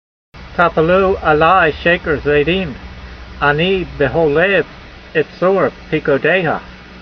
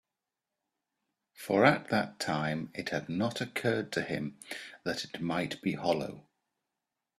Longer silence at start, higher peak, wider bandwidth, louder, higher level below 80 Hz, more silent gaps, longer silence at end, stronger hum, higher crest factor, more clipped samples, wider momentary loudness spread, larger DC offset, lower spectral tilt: second, 0.35 s vs 1.4 s; first, 0 dBFS vs -8 dBFS; second, 6.4 kHz vs 14.5 kHz; first, -14 LUFS vs -32 LUFS; first, -36 dBFS vs -70 dBFS; neither; second, 0 s vs 1 s; neither; second, 16 dB vs 26 dB; neither; about the same, 13 LU vs 14 LU; neither; first, -7.5 dB/octave vs -5.5 dB/octave